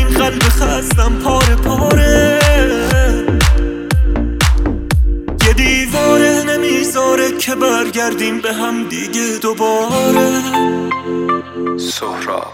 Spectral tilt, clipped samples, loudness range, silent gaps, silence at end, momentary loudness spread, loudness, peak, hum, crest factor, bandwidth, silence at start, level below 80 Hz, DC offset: -4.5 dB/octave; under 0.1%; 3 LU; none; 0 s; 8 LU; -14 LUFS; 0 dBFS; none; 12 dB; 17 kHz; 0 s; -18 dBFS; under 0.1%